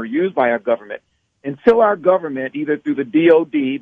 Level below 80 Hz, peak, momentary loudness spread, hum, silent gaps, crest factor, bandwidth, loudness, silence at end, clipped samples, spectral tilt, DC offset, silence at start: -60 dBFS; 0 dBFS; 15 LU; none; none; 16 dB; 5.2 kHz; -17 LUFS; 0 s; under 0.1%; -8 dB/octave; under 0.1%; 0 s